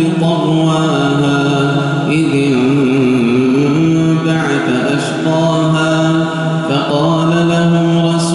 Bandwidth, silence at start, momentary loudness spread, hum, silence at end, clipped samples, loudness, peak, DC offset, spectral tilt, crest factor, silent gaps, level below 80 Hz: 11.5 kHz; 0 s; 3 LU; none; 0 s; under 0.1%; -13 LUFS; -2 dBFS; under 0.1%; -6.5 dB/octave; 10 dB; none; -48 dBFS